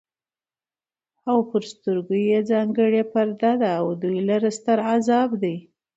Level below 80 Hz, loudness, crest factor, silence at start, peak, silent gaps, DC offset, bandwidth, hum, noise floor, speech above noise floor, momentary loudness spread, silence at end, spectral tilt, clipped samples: -72 dBFS; -22 LUFS; 14 dB; 1.25 s; -8 dBFS; none; under 0.1%; 8 kHz; none; under -90 dBFS; over 69 dB; 7 LU; 0.35 s; -6.5 dB/octave; under 0.1%